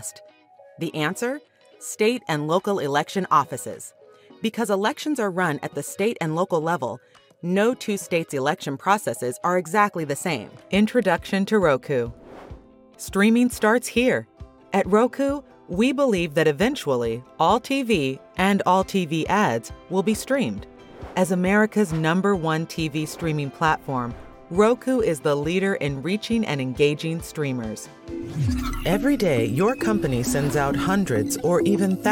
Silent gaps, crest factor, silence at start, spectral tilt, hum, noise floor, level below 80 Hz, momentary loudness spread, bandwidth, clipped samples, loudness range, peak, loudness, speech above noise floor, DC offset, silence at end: none; 18 dB; 0 s; -5.5 dB/octave; none; -45 dBFS; -46 dBFS; 11 LU; 17.5 kHz; under 0.1%; 3 LU; -4 dBFS; -23 LUFS; 22 dB; under 0.1%; 0 s